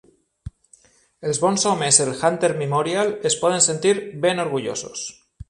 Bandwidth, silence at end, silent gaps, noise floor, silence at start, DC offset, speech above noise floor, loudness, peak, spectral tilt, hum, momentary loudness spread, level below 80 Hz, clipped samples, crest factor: 11.5 kHz; 0.05 s; none; -55 dBFS; 0.45 s; under 0.1%; 35 dB; -20 LUFS; 0 dBFS; -3 dB/octave; none; 13 LU; -52 dBFS; under 0.1%; 22 dB